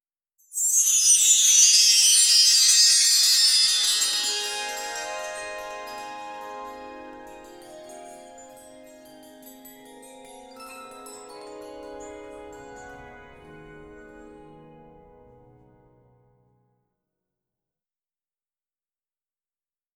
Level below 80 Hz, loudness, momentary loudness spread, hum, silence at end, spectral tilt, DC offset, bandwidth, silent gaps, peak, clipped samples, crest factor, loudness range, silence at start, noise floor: -64 dBFS; -16 LUFS; 27 LU; none; 5.75 s; 3 dB/octave; under 0.1%; over 20 kHz; none; -6 dBFS; under 0.1%; 20 dB; 27 LU; 0.55 s; under -90 dBFS